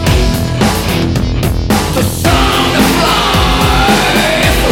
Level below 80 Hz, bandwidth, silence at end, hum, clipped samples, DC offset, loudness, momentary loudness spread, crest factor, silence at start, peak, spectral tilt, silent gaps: -18 dBFS; 17.5 kHz; 0 s; none; under 0.1%; under 0.1%; -11 LUFS; 5 LU; 10 dB; 0 s; 0 dBFS; -4.5 dB/octave; none